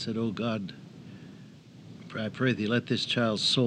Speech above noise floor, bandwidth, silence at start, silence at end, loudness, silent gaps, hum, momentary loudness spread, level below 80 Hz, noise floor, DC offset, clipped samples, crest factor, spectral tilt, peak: 21 dB; 10 kHz; 0 s; 0 s; -29 LUFS; none; none; 23 LU; -72 dBFS; -50 dBFS; under 0.1%; under 0.1%; 18 dB; -5 dB/octave; -12 dBFS